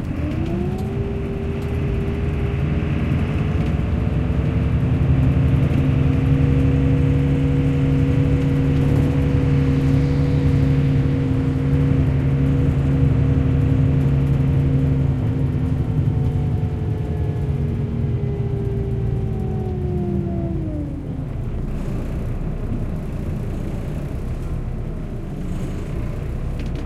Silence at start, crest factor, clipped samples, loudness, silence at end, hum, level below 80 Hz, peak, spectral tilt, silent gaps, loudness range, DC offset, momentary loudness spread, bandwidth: 0 s; 14 dB; under 0.1%; -20 LUFS; 0 s; none; -28 dBFS; -6 dBFS; -9.5 dB/octave; none; 9 LU; under 0.1%; 10 LU; 7 kHz